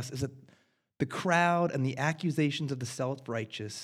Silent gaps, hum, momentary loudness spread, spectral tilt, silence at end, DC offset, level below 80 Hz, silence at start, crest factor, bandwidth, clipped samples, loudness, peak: none; none; 11 LU; -5.5 dB/octave; 0 s; under 0.1%; -68 dBFS; 0 s; 20 dB; 15 kHz; under 0.1%; -31 LUFS; -12 dBFS